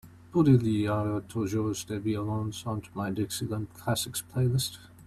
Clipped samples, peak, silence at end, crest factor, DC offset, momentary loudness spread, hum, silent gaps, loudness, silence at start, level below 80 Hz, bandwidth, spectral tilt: under 0.1%; -10 dBFS; 0.05 s; 18 dB; under 0.1%; 11 LU; none; none; -29 LUFS; 0.05 s; -56 dBFS; 15 kHz; -6 dB/octave